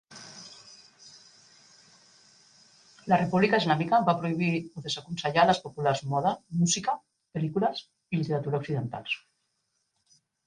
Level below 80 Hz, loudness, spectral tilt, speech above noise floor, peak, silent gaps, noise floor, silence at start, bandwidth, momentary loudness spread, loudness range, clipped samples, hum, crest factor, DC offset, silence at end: -66 dBFS; -27 LUFS; -5 dB/octave; 50 dB; -8 dBFS; none; -77 dBFS; 0.1 s; 10 kHz; 17 LU; 7 LU; under 0.1%; none; 22 dB; under 0.1%; 1.3 s